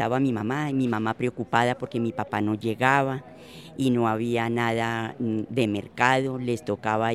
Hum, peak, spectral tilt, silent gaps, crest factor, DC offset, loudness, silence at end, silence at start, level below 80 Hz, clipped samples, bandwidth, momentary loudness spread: none; -4 dBFS; -6.5 dB/octave; none; 22 dB; under 0.1%; -25 LUFS; 0 s; 0 s; -62 dBFS; under 0.1%; 14 kHz; 7 LU